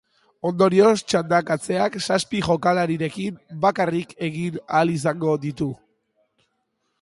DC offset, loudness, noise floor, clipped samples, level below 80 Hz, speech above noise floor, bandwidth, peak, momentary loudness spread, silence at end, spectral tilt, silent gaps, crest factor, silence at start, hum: under 0.1%; -22 LUFS; -73 dBFS; under 0.1%; -56 dBFS; 52 dB; 11.5 kHz; -4 dBFS; 12 LU; 1.25 s; -5.5 dB/octave; none; 18 dB; 0.45 s; none